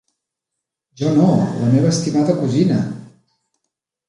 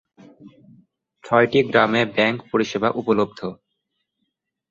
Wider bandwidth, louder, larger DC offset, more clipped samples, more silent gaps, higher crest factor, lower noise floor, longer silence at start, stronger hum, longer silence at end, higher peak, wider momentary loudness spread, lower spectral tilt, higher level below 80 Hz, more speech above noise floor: first, 11 kHz vs 7.6 kHz; about the same, -17 LUFS vs -19 LUFS; neither; neither; neither; about the same, 16 dB vs 20 dB; first, -81 dBFS vs -76 dBFS; first, 1 s vs 0.45 s; neither; about the same, 1.05 s vs 1.15 s; about the same, -4 dBFS vs -2 dBFS; about the same, 9 LU vs 8 LU; about the same, -7 dB/octave vs -6 dB/octave; about the same, -56 dBFS vs -60 dBFS; first, 66 dB vs 57 dB